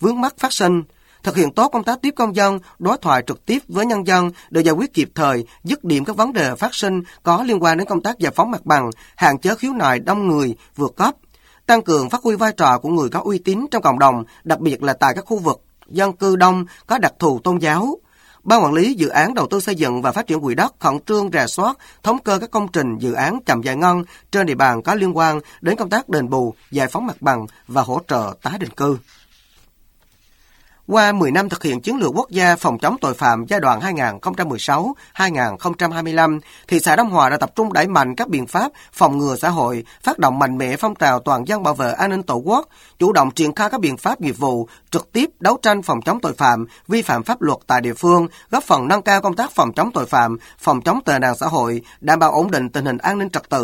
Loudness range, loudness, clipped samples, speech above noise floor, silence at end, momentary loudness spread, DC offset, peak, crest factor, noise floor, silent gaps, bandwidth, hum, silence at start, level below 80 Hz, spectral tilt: 2 LU; -18 LUFS; under 0.1%; 37 dB; 0 s; 7 LU; under 0.1%; 0 dBFS; 18 dB; -54 dBFS; none; 17 kHz; none; 0 s; -54 dBFS; -5 dB/octave